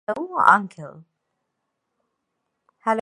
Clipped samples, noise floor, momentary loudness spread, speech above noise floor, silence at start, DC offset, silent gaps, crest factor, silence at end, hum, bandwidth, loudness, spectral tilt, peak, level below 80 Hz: under 0.1%; -78 dBFS; 24 LU; 57 dB; 0.1 s; under 0.1%; none; 24 dB; 0 s; none; 11 kHz; -19 LUFS; -5.5 dB/octave; 0 dBFS; -74 dBFS